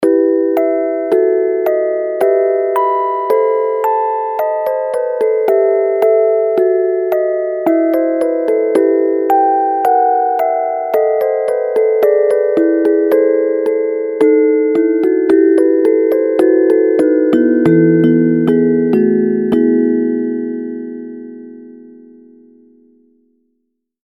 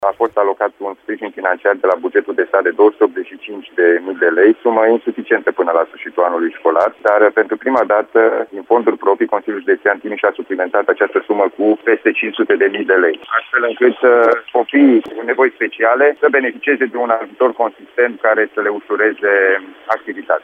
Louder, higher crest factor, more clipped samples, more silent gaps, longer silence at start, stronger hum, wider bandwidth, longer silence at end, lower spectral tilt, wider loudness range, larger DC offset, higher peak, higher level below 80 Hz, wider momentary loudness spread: about the same, -13 LUFS vs -15 LUFS; about the same, 12 dB vs 14 dB; neither; neither; about the same, 0 s vs 0 s; neither; first, 17.5 kHz vs 4.6 kHz; first, 2.15 s vs 0.05 s; first, -8.5 dB/octave vs -6.5 dB/octave; about the same, 4 LU vs 3 LU; neither; about the same, 0 dBFS vs 0 dBFS; first, -62 dBFS vs -68 dBFS; about the same, 6 LU vs 8 LU